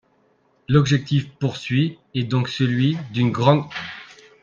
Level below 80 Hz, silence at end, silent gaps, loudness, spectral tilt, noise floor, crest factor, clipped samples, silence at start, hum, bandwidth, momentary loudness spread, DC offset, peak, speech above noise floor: -56 dBFS; 0.35 s; none; -21 LUFS; -7 dB/octave; -62 dBFS; 20 dB; under 0.1%; 0.7 s; none; 7.2 kHz; 12 LU; under 0.1%; -2 dBFS; 42 dB